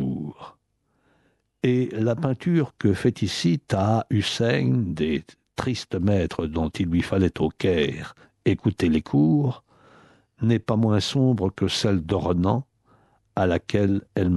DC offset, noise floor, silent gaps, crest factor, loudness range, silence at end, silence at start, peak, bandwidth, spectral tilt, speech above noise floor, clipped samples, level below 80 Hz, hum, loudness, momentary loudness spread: under 0.1%; -70 dBFS; none; 16 dB; 2 LU; 0 s; 0 s; -6 dBFS; 12 kHz; -6.5 dB/octave; 48 dB; under 0.1%; -46 dBFS; none; -24 LUFS; 7 LU